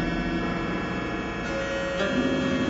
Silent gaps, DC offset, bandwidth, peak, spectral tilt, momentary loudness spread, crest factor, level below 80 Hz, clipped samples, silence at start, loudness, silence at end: none; under 0.1%; 8 kHz; -14 dBFS; -5.5 dB/octave; 5 LU; 14 dB; -42 dBFS; under 0.1%; 0 s; -27 LUFS; 0 s